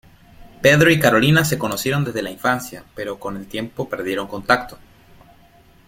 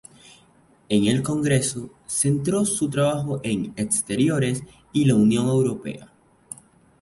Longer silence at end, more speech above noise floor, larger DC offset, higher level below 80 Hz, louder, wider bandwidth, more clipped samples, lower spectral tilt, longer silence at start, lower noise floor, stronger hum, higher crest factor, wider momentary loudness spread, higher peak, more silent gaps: first, 1.1 s vs 0.95 s; about the same, 32 dB vs 35 dB; neither; about the same, -50 dBFS vs -54 dBFS; first, -18 LUFS vs -22 LUFS; first, 16.5 kHz vs 12 kHz; neither; about the same, -5 dB/octave vs -5.5 dB/octave; second, 0.4 s vs 0.9 s; second, -50 dBFS vs -57 dBFS; neither; about the same, 18 dB vs 18 dB; about the same, 16 LU vs 16 LU; first, -2 dBFS vs -6 dBFS; neither